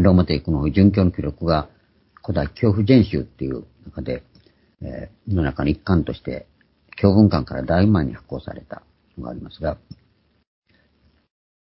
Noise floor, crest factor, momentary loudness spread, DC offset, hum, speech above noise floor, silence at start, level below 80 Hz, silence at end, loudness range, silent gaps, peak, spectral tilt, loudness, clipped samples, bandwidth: -61 dBFS; 20 dB; 21 LU; under 0.1%; none; 41 dB; 0 s; -34 dBFS; 1.85 s; 6 LU; none; -2 dBFS; -12.5 dB/octave; -20 LUFS; under 0.1%; 5.8 kHz